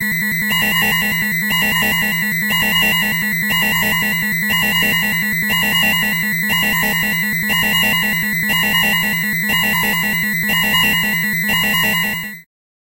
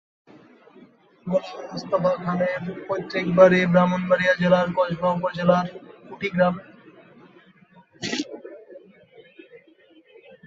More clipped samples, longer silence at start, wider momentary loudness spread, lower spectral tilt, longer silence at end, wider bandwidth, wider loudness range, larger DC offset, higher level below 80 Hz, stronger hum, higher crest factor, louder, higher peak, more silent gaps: neither; second, 0 s vs 1.25 s; second, 3 LU vs 18 LU; second, -2.5 dB/octave vs -6.5 dB/octave; second, 0.55 s vs 0.9 s; first, 16.5 kHz vs 7.6 kHz; second, 0 LU vs 17 LU; neither; first, -42 dBFS vs -62 dBFS; neither; second, 14 dB vs 22 dB; first, -14 LUFS vs -22 LUFS; about the same, -4 dBFS vs -2 dBFS; neither